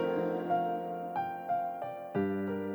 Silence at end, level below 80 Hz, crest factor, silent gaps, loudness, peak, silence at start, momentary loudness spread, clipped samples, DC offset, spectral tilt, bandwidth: 0 s; -80 dBFS; 14 dB; none; -34 LUFS; -20 dBFS; 0 s; 5 LU; under 0.1%; under 0.1%; -8.5 dB/octave; over 20 kHz